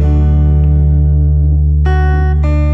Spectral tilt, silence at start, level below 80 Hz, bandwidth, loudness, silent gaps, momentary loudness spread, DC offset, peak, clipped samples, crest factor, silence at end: -10 dB/octave; 0 s; -10 dBFS; 3.5 kHz; -11 LUFS; none; 2 LU; under 0.1%; -2 dBFS; under 0.1%; 6 dB; 0 s